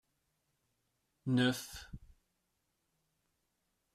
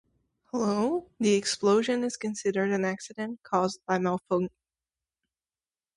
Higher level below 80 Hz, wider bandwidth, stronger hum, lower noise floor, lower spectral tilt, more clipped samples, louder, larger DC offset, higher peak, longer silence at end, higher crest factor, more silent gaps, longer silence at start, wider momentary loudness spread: about the same, -64 dBFS vs -68 dBFS; first, 14 kHz vs 11.5 kHz; neither; second, -82 dBFS vs under -90 dBFS; about the same, -5 dB/octave vs -5 dB/octave; neither; second, -35 LUFS vs -28 LUFS; neither; second, -18 dBFS vs -12 dBFS; first, 1.95 s vs 1.5 s; first, 24 dB vs 18 dB; neither; first, 1.25 s vs 0.55 s; first, 22 LU vs 10 LU